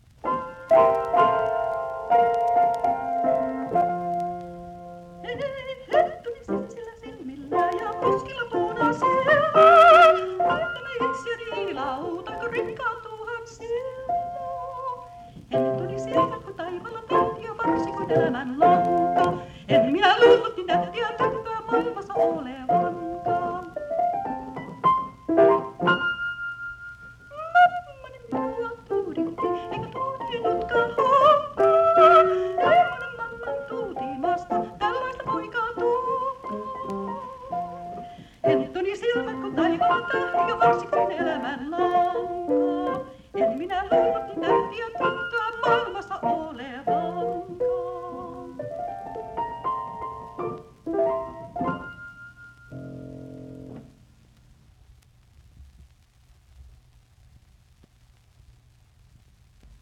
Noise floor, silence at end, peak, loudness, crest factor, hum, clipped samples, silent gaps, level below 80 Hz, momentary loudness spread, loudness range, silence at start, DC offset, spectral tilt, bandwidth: -57 dBFS; 3.2 s; -4 dBFS; -23 LUFS; 20 dB; none; under 0.1%; none; -56 dBFS; 17 LU; 12 LU; 0.25 s; under 0.1%; -6 dB/octave; 9.4 kHz